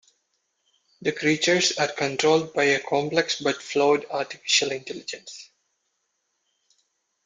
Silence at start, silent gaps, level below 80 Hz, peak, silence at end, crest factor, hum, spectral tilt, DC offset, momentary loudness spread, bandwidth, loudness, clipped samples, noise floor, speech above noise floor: 1 s; none; -70 dBFS; -6 dBFS; 1.8 s; 20 dB; none; -2.5 dB/octave; under 0.1%; 14 LU; 9.6 kHz; -23 LUFS; under 0.1%; -76 dBFS; 52 dB